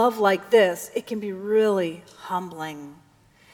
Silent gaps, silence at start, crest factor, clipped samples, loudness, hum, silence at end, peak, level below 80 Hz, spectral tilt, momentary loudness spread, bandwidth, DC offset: none; 0 s; 18 dB; under 0.1%; -23 LUFS; none; 0.6 s; -6 dBFS; -70 dBFS; -4.5 dB/octave; 16 LU; 18 kHz; under 0.1%